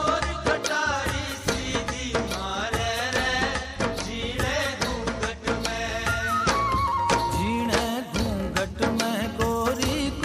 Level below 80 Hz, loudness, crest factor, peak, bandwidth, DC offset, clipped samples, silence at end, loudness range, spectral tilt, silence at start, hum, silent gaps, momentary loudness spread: -38 dBFS; -26 LUFS; 20 dB; -6 dBFS; 15.5 kHz; under 0.1%; under 0.1%; 0 s; 2 LU; -4 dB/octave; 0 s; none; none; 5 LU